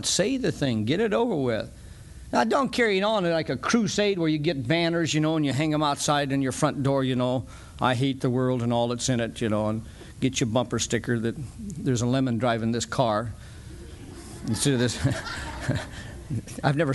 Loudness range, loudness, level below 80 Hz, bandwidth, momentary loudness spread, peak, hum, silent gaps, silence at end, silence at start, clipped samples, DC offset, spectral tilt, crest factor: 4 LU; -25 LUFS; -48 dBFS; 12.5 kHz; 14 LU; -6 dBFS; none; none; 0 s; 0 s; under 0.1%; under 0.1%; -5 dB/octave; 20 dB